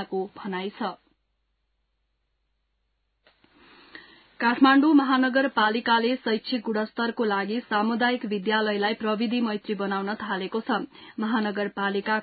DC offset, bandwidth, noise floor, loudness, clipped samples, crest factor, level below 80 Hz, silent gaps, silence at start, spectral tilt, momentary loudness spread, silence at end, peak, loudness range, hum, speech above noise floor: under 0.1%; 4.9 kHz; -75 dBFS; -25 LUFS; under 0.1%; 20 dB; -72 dBFS; none; 0 s; -9.5 dB/octave; 12 LU; 0 s; -6 dBFS; 14 LU; none; 50 dB